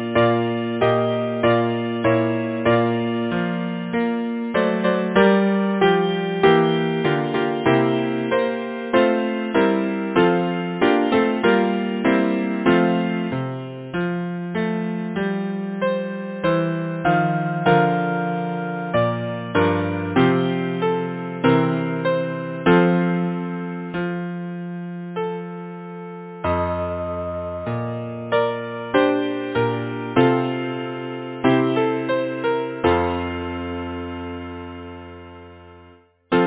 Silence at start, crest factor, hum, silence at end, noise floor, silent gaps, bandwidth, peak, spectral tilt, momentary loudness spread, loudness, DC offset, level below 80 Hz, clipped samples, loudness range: 0 s; 18 dB; none; 0 s; -50 dBFS; none; 4 kHz; -2 dBFS; -11 dB/octave; 11 LU; -21 LUFS; under 0.1%; -48 dBFS; under 0.1%; 7 LU